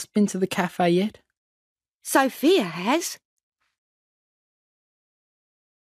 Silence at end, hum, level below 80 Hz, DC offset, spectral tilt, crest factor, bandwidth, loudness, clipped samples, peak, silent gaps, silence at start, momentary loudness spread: 2.65 s; none; -72 dBFS; under 0.1%; -4.5 dB/octave; 20 dB; 15.5 kHz; -23 LUFS; under 0.1%; -6 dBFS; 1.37-1.76 s, 1.95-2.00 s; 0 s; 11 LU